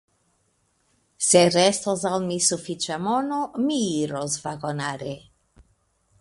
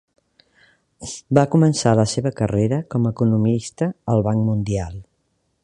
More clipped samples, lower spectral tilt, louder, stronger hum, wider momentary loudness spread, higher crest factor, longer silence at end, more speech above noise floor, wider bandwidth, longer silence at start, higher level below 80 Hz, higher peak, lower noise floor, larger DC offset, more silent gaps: neither; second, -3.5 dB/octave vs -6.5 dB/octave; second, -23 LUFS vs -19 LUFS; neither; about the same, 13 LU vs 15 LU; about the same, 22 dB vs 20 dB; first, 1 s vs 0.6 s; second, 45 dB vs 50 dB; about the same, 11.5 kHz vs 11 kHz; first, 1.2 s vs 1 s; second, -62 dBFS vs -46 dBFS; second, -4 dBFS vs 0 dBFS; about the same, -68 dBFS vs -69 dBFS; neither; neither